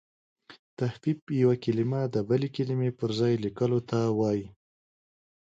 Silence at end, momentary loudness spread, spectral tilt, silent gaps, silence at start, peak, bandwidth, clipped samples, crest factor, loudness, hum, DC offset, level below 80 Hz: 1.05 s; 7 LU; -8 dB/octave; 0.59-0.77 s, 1.22-1.27 s; 0.5 s; -12 dBFS; 7.8 kHz; under 0.1%; 18 dB; -28 LUFS; none; under 0.1%; -64 dBFS